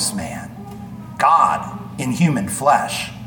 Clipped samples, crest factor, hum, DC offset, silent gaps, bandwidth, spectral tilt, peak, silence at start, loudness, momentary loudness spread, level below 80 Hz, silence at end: under 0.1%; 18 dB; none; under 0.1%; none; 19 kHz; -4.5 dB/octave; -2 dBFS; 0 s; -18 LUFS; 19 LU; -50 dBFS; 0 s